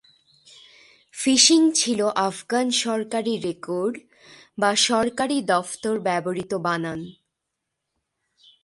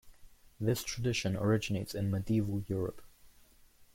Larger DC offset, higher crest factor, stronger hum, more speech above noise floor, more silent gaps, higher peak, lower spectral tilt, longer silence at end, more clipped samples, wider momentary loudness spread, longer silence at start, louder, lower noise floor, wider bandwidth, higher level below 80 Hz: neither; about the same, 22 dB vs 18 dB; neither; first, 59 dB vs 29 dB; neither; first, -2 dBFS vs -18 dBFS; second, -2.5 dB/octave vs -6 dB/octave; first, 1.55 s vs 0.1 s; neither; first, 13 LU vs 6 LU; first, 1.15 s vs 0.05 s; first, -22 LUFS vs -34 LUFS; first, -81 dBFS vs -62 dBFS; second, 11.5 kHz vs 16.5 kHz; second, -64 dBFS vs -56 dBFS